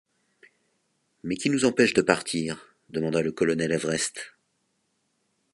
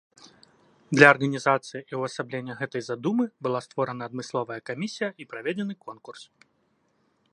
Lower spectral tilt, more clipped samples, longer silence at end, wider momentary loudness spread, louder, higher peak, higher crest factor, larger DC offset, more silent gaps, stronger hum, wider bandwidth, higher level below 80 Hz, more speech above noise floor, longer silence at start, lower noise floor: second, -4 dB/octave vs -5.5 dB/octave; neither; first, 1.25 s vs 1.1 s; about the same, 17 LU vs 18 LU; about the same, -25 LUFS vs -26 LUFS; about the same, -2 dBFS vs 0 dBFS; about the same, 26 dB vs 28 dB; neither; neither; neither; about the same, 11.5 kHz vs 11 kHz; first, -62 dBFS vs -74 dBFS; first, 49 dB vs 43 dB; first, 1.25 s vs 0.9 s; first, -74 dBFS vs -70 dBFS